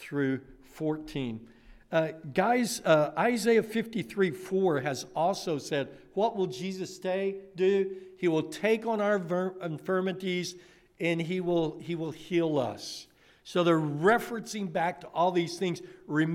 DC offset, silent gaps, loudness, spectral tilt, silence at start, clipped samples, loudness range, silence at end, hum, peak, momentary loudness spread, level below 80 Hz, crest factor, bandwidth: under 0.1%; none; -30 LUFS; -5.5 dB/octave; 0 s; under 0.1%; 4 LU; 0 s; none; -12 dBFS; 10 LU; -64 dBFS; 18 dB; 16 kHz